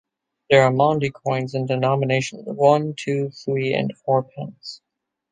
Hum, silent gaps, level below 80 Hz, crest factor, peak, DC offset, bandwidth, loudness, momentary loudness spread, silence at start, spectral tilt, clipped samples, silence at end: none; none; -62 dBFS; 20 dB; -2 dBFS; under 0.1%; 9.6 kHz; -21 LUFS; 15 LU; 0.5 s; -6 dB/octave; under 0.1%; 0.55 s